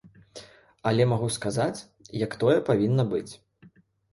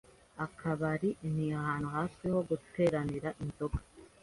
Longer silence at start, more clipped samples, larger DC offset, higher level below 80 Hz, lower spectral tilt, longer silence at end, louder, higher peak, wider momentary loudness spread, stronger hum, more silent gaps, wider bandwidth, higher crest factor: second, 0.05 s vs 0.35 s; neither; neither; second, -60 dBFS vs -52 dBFS; second, -6.5 dB/octave vs -8 dB/octave; first, 0.8 s vs 0.15 s; first, -26 LUFS vs -35 LUFS; first, -8 dBFS vs -18 dBFS; first, 23 LU vs 9 LU; neither; neither; about the same, 11.5 kHz vs 11.5 kHz; about the same, 18 dB vs 18 dB